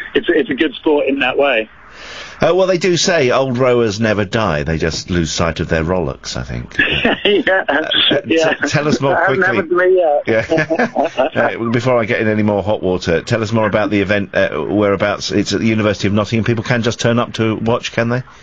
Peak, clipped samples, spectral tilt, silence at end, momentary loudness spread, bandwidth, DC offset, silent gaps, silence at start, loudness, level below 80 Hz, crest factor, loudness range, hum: 0 dBFS; under 0.1%; -5 dB/octave; 0.1 s; 5 LU; 9 kHz; 0.5%; none; 0 s; -15 LUFS; -40 dBFS; 16 dB; 3 LU; none